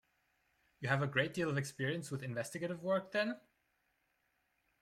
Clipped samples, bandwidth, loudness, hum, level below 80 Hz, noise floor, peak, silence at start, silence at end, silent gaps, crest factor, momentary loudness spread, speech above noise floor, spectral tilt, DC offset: under 0.1%; 15 kHz; -38 LUFS; none; -76 dBFS; -80 dBFS; -18 dBFS; 0.8 s; 1.45 s; none; 22 dB; 7 LU; 43 dB; -5.5 dB/octave; under 0.1%